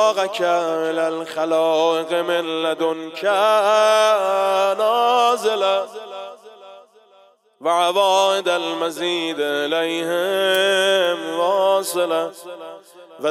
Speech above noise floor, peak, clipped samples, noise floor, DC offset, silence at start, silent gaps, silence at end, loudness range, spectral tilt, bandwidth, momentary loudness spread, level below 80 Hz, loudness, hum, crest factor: 35 dB; -4 dBFS; under 0.1%; -53 dBFS; under 0.1%; 0 s; none; 0 s; 4 LU; -2.5 dB/octave; 16 kHz; 9 LU; -82 dBFS; -19 LUFS; none; 14 dB